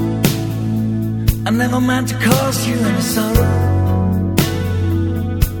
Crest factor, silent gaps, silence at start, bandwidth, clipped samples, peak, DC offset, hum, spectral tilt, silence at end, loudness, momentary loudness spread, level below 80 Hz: 16 dB; none; 0 s; 17.5 kHz; under 0.1%; 0 dBFS; under 0.1%; none; -5.5 dB/octave; 0 s; -17 LUFS; 4 LU; -28 dBFS